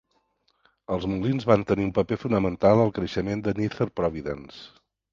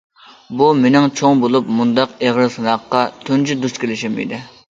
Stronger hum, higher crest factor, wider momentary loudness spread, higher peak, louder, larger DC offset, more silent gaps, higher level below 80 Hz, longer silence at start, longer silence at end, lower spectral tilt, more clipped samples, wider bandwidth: neither; first, 22 dB vs 16 dB; first, 13 LU vs 9 LU; about the same, -2 dBFS vs 0 dBFS; second, -25 LUFS vs -16 LUFS; neither; neither; first, -48 dBFS vs -60 dBFS; first, 0.9 s vs 0.5 s; first, 0.45 s vs 0.2 s; first, -8 dB/octave vs -5.5 dB/octave; neither; about the same, 7.4 kHz vs 7.8 kHz